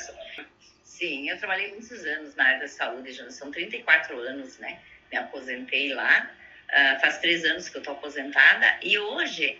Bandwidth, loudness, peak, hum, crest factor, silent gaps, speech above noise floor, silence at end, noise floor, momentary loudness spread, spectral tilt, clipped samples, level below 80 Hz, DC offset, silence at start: 7.8 kHz; -23 LUFS; -4 dBFS; none; 22 dB; none; 29 dB; 0 s; -55 dBFS; 19 LU; -1.5 dB/octave; under 0.1%; -70 dBFS; under 0.1%; 0 s